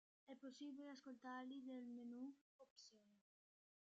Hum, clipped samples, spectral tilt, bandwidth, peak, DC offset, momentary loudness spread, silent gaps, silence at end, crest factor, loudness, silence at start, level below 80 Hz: none; under 0.1%; -2.5 dB/octave; 8 kHz; -44 dBFS; under 0.1%; 12 LU; 2.41-2.59 s, 2.70-2.76 s; 0.65 s; 14 dB; -57 LUFS; 0.25 s; under -90 dBFS